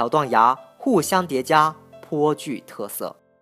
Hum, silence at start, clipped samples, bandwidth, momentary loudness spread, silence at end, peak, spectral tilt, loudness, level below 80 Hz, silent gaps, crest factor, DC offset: none; 0 s; under 0.1%; 15.5 kHz; 14 LU; 0.3 s; -2 dBFS; -4.5 dB/octave; -21 LUFS; -72 dBFS; none; 20 dB; under 0.1%